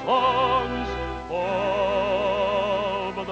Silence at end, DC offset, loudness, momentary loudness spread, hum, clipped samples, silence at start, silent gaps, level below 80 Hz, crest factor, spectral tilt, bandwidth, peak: 0 s; under 0.1%; -24 LUFS; 8 LU; none; under 0.1%; 0 s; none; -42 dBFS; 14 dB; -5.5 dB/octave; 8.4 kHz; -10 dBFS